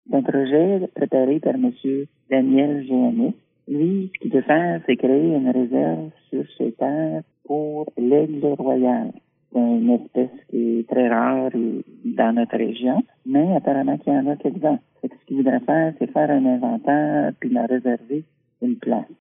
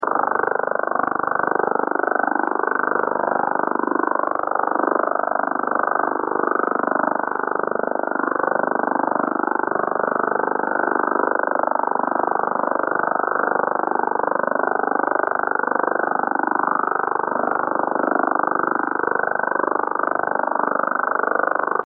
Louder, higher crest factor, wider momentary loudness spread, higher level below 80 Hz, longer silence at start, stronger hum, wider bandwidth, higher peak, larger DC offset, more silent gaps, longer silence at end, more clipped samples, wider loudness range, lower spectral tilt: about the same, -21 LUFS vs -21 LUFS; about the same, 18 dB vs 14 dB; first, 9 LU vs 2 LU; second, -78 dBFS vs -70 dBFS; about the same, 0.1 s vs 0 s; second, none vs 50 Hz at -60 dBFS; about the same, 3.8 kHz vs 3.5 kHz; first, -2 dBFS vs -6 dBFS; neither; neither; about the same, 0.1 s vs 0 s; neither; about the same, 2 LU vs 1 LU; second, -6.5 dB/octave vs -11 dB/octave